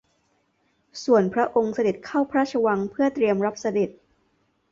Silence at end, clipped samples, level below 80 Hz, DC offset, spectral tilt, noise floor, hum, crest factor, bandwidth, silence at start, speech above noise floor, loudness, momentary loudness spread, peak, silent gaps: 0.8 s; under 0.1%; -64 dBFS; under 0.1%; -6 dB/octave; -68 dBFS; none; 18 dB; 7.6 kHz; 0.95 s; 46 dB; -23 LUFS; 6 LU; -6 dBFS; none